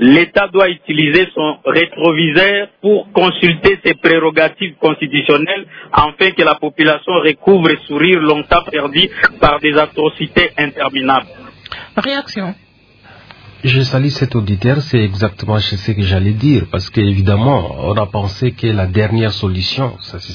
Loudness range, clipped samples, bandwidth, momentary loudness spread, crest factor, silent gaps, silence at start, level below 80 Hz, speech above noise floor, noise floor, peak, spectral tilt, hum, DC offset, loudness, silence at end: 5 LU; under 0.1%; 5.4 kHz; 7 LU; 14 dB; none; 0 s; -38 dBFS; 31 dB; -44 dBFS; 0 dBFS; -7 dB/octave; none; under 0.1%; -13 LUFS; 0 s